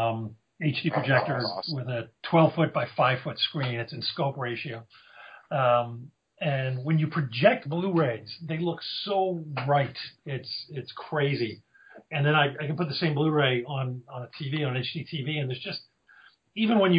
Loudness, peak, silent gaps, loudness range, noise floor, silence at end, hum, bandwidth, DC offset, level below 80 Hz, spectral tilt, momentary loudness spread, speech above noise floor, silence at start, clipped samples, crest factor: -27 LUFS; -8 dBFS; none; 4 LU; -58 dBFS; 0 s; none; 5.2 kHz; under 0.1%; -70 dBFS; -9.5 dB/octave; 13 LU; 31 dB; 0 s; under 0.1%; 20 dB